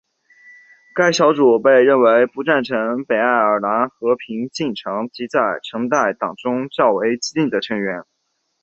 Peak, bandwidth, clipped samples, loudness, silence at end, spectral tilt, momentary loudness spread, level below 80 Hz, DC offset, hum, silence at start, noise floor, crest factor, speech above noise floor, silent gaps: -2 dBFS; 8 kHz; under 0.1%; -17 LUFS; 0.6 s; -4.5 dB/octave; 12 LU; -64 dBFS; under 0.1%; none; 0.95 s; -49 dBFS; 16 dB; 32 dB; none